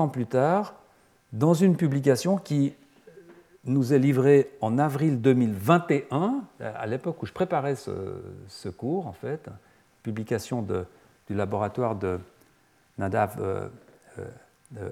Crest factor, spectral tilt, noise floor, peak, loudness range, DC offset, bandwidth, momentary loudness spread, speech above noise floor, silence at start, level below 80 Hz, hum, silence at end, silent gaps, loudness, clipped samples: 22 dB; -7.5 dB/octave; -63 dBFS; -4 dBFS; 9 LU; under 0.1%; 16 kHz; 19 LU; 38 dB; 0 s; -68 dBFS; none; 0 s; none; -26 LUFS; under 0.1%